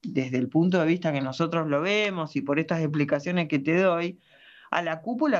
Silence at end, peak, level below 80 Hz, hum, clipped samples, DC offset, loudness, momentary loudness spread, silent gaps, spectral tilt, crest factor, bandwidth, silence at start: 0 s; -8 dBFS; -72 dBFS; none; under 0.1%; under 0.1%; -26 LUFS; 6 LU; none; -7 dB/octave; 18 dB; 7.6 kHz; 0.05 s